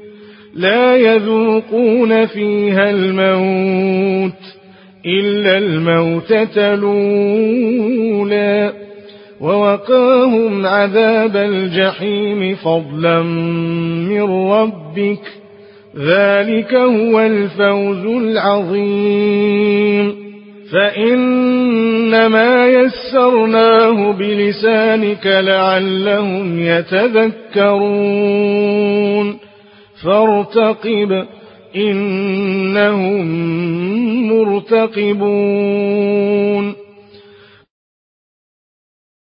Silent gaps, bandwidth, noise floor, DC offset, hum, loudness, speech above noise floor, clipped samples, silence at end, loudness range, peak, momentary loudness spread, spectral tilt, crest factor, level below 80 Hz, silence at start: none; 5.4 kHz; -43 dBFS; under 0.1%; none; -13 LUFS; 31 dB; under 0.1%; 2.55 s; 4 LU; 0 dBFS; 7 LU; -11.5 dB/octave; 14 dB; -60 dBFS; 0 s